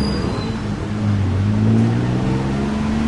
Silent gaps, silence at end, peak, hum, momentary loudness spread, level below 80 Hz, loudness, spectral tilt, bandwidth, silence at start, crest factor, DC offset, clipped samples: none; 0 s; -6 dBFS; none; 7 LU; -32 dBFS; -19 LUFS; -7.5 dB/octave; 11 kHz; 0 s; 12 dB; under 0.1%; under 0.1%